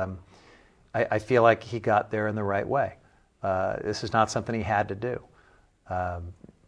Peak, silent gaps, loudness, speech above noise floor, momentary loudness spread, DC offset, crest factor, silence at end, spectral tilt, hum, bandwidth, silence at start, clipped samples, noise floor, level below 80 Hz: -6 dBFS; none; -27 LUFS; 33 dB; 13 LU; under 0.1%; 22 dB; 0.35 s; -6 dB/octave; none; 10.5 kHz; 0 s; under 0.1%; -60 dBFS; -56 dBFS